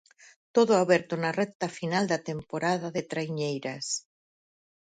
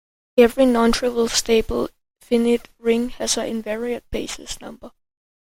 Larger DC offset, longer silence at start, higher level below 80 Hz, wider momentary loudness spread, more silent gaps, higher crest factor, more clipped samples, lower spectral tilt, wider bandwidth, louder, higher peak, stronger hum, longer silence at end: neither; first, 0.55 s vs 0.35 s; second, -70 dBFS vs -40 dBFS; second, 10 LU vs 14 LU; first, 1.55-1.60 s vs none; about the same, 20 dB vs 18 dB; neither; first, -4.5 dB/octave vs -3 dB/octave; second, 9.6 kHz vs 16.5 kHz; second, -28 LUFS vs -20 LUFS; second, -8 dBFS vs -2 dBFS; neither; first, 0.9 s vs 0.6 s